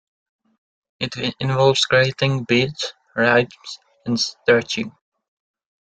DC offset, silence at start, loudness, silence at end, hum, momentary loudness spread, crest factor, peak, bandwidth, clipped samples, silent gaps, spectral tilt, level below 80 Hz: under 0.1%; 1 s; -19 LUFS; 0.9 s; none; 13 LU; 20 dB; -2 dBFS; 9.2 kHz; under 0.1%; none; -4.5 dB/octave; -58 dBFS